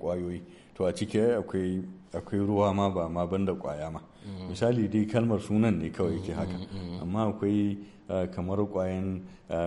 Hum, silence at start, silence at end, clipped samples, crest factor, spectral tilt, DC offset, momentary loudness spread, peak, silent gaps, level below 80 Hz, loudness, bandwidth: none; 0 s; 0 s; under 0.1%; 18 dB; -8 dB/octave; under 0.1%; 13 LU; -12 dBFS; none; -54 dBFS; -30 LUFS; 11.5 kHz